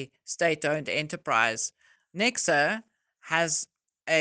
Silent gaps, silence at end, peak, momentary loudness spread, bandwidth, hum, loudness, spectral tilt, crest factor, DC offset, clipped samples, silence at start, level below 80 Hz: none; 0 s; -8 dBFS; 12 LU; 10.5 kHz; none; -27 LUFS; -2.5 dB/octave; 20 dB; under 0.1%; under 0.1%; 0 s; -72 dBFS